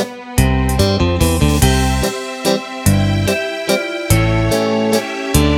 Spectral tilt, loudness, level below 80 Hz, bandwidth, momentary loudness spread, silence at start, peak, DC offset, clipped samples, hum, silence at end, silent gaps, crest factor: -5 dB/octave; -15 LUFS; -22 dBFS; 17.5 kHz; 5 LU; 0 s; 0 dBFS; under 0.1%; under 0.1%; none; 0 s; none; 14 dB